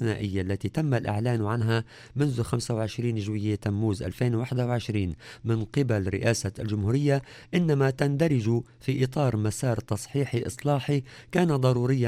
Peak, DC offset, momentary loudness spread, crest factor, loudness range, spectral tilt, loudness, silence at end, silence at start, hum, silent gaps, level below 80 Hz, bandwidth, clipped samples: -8 dBFS; under 0.1%; 6 LU; 18 dB; 2 LU; -6.5 dB/octave; -27 LUFS; 0 s; 0 s; none; none; -54 dBFS; 14.5 kHz; under 0.1%